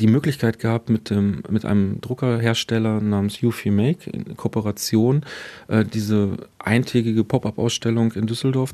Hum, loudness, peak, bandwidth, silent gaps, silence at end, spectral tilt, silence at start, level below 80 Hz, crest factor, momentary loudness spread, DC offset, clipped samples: none; -21 LUFS; -2 dBFS; 14 kHz; none; 0 s; -6.5 dB/octave; 0 s; -54 dBFS; 18 dB; 5 LU; under 0.1%; under 0.1%